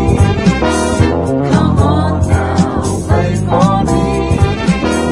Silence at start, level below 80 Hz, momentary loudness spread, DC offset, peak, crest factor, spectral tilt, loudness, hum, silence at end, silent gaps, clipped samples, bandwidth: 0 s; -24 dBFS; 3 LU; under 0.1%; 0 dBFS; 12 dB; -6.5 dB/octave; -13 LUFS; none; 0 s; none; under 0.1%; 11.5 kHz